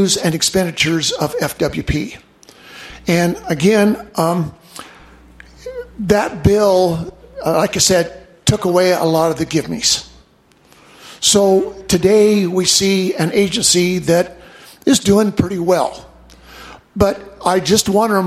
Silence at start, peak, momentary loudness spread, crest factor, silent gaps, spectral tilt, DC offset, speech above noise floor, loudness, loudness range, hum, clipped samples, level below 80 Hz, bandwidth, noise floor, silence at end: 0 s; 0 dBFS; 13 LU; 16 dB; none; -4 dB/octave; under 0.1%; 37 dB; -15 LUFS; 5 LU; none; under 0.1%; -40 dBFS; 15.5 kHz; -51 dBFS; 0 s